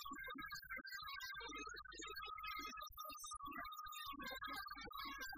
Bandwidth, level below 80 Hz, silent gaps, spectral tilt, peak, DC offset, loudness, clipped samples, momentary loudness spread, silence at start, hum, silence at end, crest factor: 15.5 kHz; -70 dBFS; none; -1.5 dB/octave; -38 dBFS; under 0.1%; -50 LUFS; under 0.1%; 3 LU; 0 s; none; 0 s; 14 dB